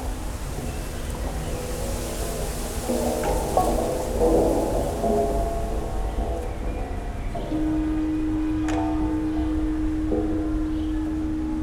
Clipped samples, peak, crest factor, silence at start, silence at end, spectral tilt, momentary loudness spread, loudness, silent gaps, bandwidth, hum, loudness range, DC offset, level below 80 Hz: under 0.1%; -6 dBFS; 18 dB; 0 s; 0 s; -6 dB/octave; 9 LU; -26 LUFS; none; 19 kHz; none; 4 LU; under 0.1%; -30 dBFS